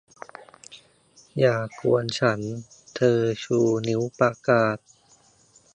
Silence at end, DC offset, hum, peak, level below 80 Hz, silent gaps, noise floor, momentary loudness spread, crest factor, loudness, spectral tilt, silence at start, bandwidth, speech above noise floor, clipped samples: 1 s; under 0.1%; none; -6 dBFS; -64 dBFS; none; -58 dBFS; 21 LU; 20 dB; -23 LUFS; -6 dB/octave; 0.7 s; 9.8 kHz; 36 dB; under 0.1%